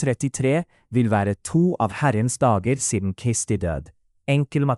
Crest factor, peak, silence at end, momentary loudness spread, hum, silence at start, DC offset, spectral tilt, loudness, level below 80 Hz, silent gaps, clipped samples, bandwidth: 14 dB; -8 dBFS; 0 s; 5 LU; none; 0 s; under 0.1%; -6 dB/octave; -22 LUFS; -46 dBFS; none; under 0.1%; 12 kHz